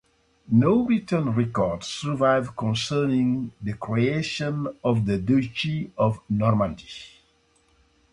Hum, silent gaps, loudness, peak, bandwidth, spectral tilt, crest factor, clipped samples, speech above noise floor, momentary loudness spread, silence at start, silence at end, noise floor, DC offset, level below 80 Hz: none; none; -24 LUFS; -8 dBFS; 11 kHz; -6.5 dB/octave; 16 dB; under 0.1%; 40 dB; 8 LU; 0.5 s; 1.05 s; -63 dBFS; under 0.1%; -52 dBFS